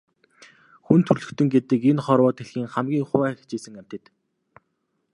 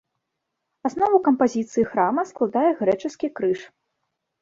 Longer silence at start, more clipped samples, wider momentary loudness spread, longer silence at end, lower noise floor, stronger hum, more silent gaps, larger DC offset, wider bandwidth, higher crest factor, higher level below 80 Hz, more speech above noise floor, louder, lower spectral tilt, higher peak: about the same, 0.9 s vs 0.85 s; neither; first, 18 LU vs 10 LU; first, 1.15 s vs 0.75 s; second, -74 dBFS vs -80 dBFS; neither; neither; neither; first, 11 kHz vs 7.8 kHz; about the same, 22 dB vs 18 dB; about the same, -64 dBFS vs -64 dBFS; second, 52 dB vs 58 dB; about the same, -22 LUFS vs -22 LUFS; first, -8 dB/octave vs -6.5 dB/octave; first, -2 dBFS vs -6 dBFS